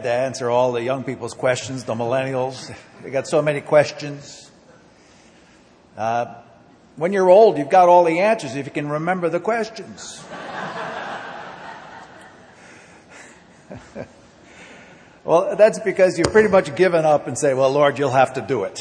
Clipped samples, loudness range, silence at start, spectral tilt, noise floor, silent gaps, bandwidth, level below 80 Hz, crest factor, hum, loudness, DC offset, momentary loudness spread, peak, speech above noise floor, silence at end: under 0.1%; 17 LU; 0 s; -5 dB/octave; -51 dBFS; none; 10 kHz; -56 dBFS; 20 dB; none; -18 LUFS; under 0.1%; 21 LU; 0 dBFS; 32 dB; 0 s